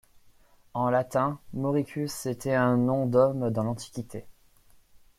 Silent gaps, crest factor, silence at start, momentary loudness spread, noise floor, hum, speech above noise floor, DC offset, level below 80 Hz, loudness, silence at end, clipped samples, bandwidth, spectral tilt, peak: none; 18 dB; 0.75 s; 14 LU; -58 dBFS; none; 31 dB; under 0.1%; -60 dBFS; -27 LUFS; 0.85 s; under 0.1%; 15.5 kHz; -7 dB/octave; -10 dBFS